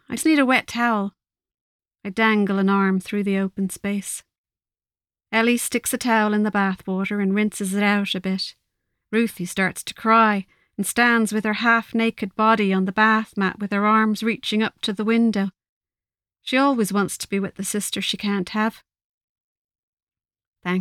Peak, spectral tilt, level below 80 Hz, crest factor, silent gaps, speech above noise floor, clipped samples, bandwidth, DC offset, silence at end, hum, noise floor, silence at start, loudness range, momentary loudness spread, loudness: -4 dBFS; -4.5 dB/octave; -62 dBFS; 18 dB; 1.61-1.79 s, 4.38-4.44 s, 15.69-15.81 s, 19.04-19.69 s, 19.79-19.97 s, 20.03-20.07 s, 20.47-20.53 s; over 69 dB; under 0.1%; 15.5 kHz; under 0.1%; 0 s; none; under -90 dBFS; 0.1 s; 4 LU; 9 LU; -21 LUFS